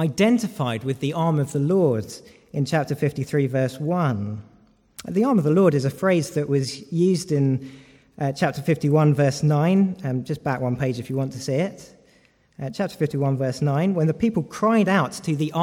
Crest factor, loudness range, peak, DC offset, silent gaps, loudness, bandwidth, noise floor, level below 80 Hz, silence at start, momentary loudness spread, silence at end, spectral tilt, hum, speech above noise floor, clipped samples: 16 dB; 4 LU; -6 dBFS; under 0.1%; none; -22 LUFS; 16 kHz; -58 dBFS; -58 dBFS; 0 s; 9 LU; 0 s; -7 dB/octave; none; 37 dB; under 0.1%